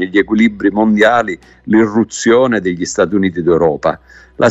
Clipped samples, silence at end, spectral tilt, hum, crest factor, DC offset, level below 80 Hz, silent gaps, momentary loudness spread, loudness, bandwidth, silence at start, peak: under 0.1%; 0 s; -5.5 dB/octave; none; 12 dB; under 0.1%; -44 dBFS; none; 7 LU; -13 LUFS; 8.2 kHz; 0 s; 0 dBFS